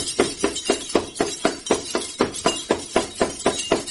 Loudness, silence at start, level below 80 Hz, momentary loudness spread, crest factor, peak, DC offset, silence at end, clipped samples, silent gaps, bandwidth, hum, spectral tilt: -23 LUFS; 0 s; -48 dBFS; 3 LU; 20 dB; -4 dBFS; under 0.1%; 0 s; under 0.1%; none; 11.5 kHz; none; -2.5 dB/octave